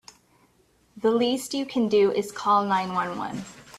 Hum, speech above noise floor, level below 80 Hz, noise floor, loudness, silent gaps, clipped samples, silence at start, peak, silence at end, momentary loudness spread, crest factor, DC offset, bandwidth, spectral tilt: none; 39 dB; -64 dBFS; -63 dBFS; -24 LUFS; none; under 0.1%; 0.95 s; -10 dBFS; 0 s; 10 LU; 16 dB; under 0.1%; 14.5 kHz; -5 dB/octave